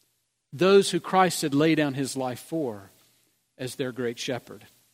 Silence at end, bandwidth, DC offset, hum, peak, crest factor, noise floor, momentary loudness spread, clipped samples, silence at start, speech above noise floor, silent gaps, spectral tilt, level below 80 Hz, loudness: 0.35 s; 16 kHz; under 0.1%; none; -6 dBFS; 20 dB; -74 dBFS; 16 LU; under 0.1%; 0.55 s; 49 dB; none; -5 dB/octave; -72 dBFS; -25 LUFS